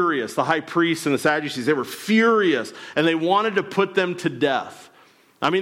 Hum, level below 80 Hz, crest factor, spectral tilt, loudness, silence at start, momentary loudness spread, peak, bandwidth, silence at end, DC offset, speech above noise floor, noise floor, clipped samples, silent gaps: none; -70 dBFS; 16 dB; -5 dB/octave; -21 LUFS; 0 s; 7 LU; -6 dBFS; 16.5 kHz; 0 s; under 0.1%; 33 dB; -54 dBFS; under 0.1%; none